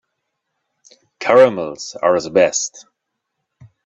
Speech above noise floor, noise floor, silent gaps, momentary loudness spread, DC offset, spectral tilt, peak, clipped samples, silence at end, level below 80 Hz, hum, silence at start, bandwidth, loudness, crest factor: 61 dB; -76 dBFS; none; 14 LU; under 0.1%; -3 dB/octave; 0 dBFS; under 0.1%; 1.05 s; -62 dBFS; none; 1.2 s; 8 kHz; -16 LUFS; 18 dB